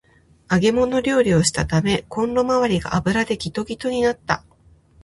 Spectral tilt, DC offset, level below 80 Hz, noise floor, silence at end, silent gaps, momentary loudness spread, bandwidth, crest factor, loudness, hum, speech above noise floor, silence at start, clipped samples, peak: -5 dB/octave; under 0.1%; -42 dBFS; -53 dBFS; 0.65 s; none; 8 LU; 11.5 kHz; 18 dB; -20 LUFS; none; 34 dB; 0.5 s; under 0.1%; -2 dBFS